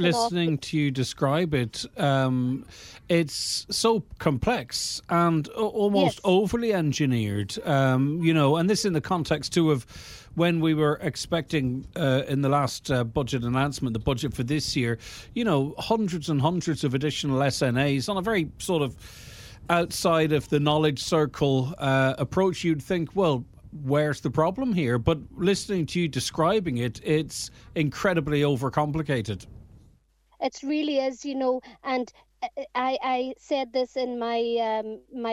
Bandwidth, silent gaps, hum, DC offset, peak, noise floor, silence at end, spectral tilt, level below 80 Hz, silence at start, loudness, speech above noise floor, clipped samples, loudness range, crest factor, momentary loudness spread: 16 kHz; none; none; under 0.1%; -6 dBFS; -62 dBFS; 0 s; -5.5 dB/octave; -50 dBFS; 0 s; -25 LUFS; 37 dB; under 0.1%; 4 LU; 18 dB; 8 LU